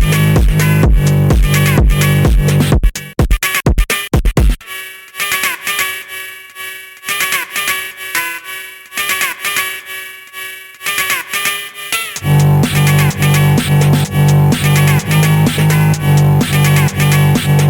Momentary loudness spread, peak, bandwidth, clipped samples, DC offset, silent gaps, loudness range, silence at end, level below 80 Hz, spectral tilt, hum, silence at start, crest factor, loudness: 14 LU; 0 dBFS; 19.5 kHz; under 0.1%; under 0.1%; none; 7 LU; 0 s; -20 dBFS; -5 dB/octave; none; 0 s; 12 dB; -13 LUFS